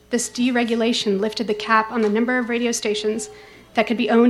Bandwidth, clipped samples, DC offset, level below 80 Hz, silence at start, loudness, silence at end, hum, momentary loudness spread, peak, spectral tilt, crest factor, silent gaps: 13 kHz; under 0.1%; under 0.1%; -58 dBFS; 0.1 s; -21 LUFS; 0 s; none; 6 LU; -2 dBFS; -3.5 dB/octave; 18 dB; none